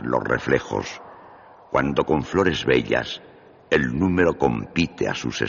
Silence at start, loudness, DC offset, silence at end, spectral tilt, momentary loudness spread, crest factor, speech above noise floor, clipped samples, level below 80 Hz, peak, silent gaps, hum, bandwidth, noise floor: 0 s; -22 LUFS; under 0.1%; 0 s; -4.5 dB/octave; 9 LU; 18 dB; 25 dB; under 0.1%; -44 dBFS; -4 dBFS; none; none; 7.2 kHz; -47 dBFS